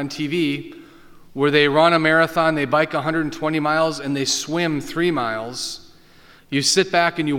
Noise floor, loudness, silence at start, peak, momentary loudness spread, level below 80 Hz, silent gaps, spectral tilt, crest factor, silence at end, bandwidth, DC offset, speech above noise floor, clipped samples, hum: -49 dBFS; -19 LUFS; 0 s; -2 dBFS; 12 LU; -54 dBFS; none; -4 dB/octave; 18 dB; 0 s; 18.5 kHz; under 0.1%; 29 dB; under 0.1%; none